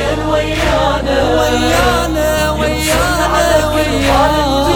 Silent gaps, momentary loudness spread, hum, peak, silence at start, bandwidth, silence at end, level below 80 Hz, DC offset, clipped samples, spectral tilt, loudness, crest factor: none; 3 LU; none; 0 dBFS; 0 s; over 20 kHz; 0 s; -22 dBFS; 0.1%; under 0.1%; -4.5 dB/octave; -13 LUFS; 12 dB